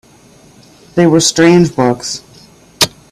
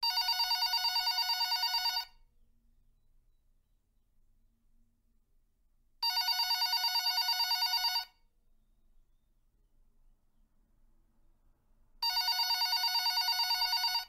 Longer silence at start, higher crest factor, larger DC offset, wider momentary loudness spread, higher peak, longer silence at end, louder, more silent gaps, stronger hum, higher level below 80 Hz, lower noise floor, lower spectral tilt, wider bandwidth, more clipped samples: first, 0.95 s vs 0 s; about the same, 14 dB vs 14 dB; neither; first, 12 LU vs 4 LU; first, 0 dBFS vs -20 dBFS; first, 0.25 s vs 0 s; first, -11 LUFS vs -29 LUFS; neither; second, none vs 60 Hz at -90 dBFS; first, -48 dBFS vs -68 dBFS; second, -43 dBFS vs -72 dBFS; first, -4.5 dB/octave vs 4 dB/octave; about the same, 15.5 kHz vs 16 kHz; neither